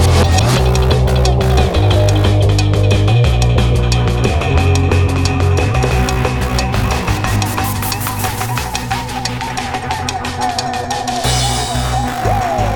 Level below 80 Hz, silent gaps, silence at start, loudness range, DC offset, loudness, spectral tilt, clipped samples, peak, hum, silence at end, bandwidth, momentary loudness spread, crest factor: -20 dBFS; none; 0 s; 6 LU; under 0.1%; -15 LUFS; -5 dB/octave; under 0.1%; 0 dBFS; none; 0 s; 19.5 kHz; 7 LU; 12 dB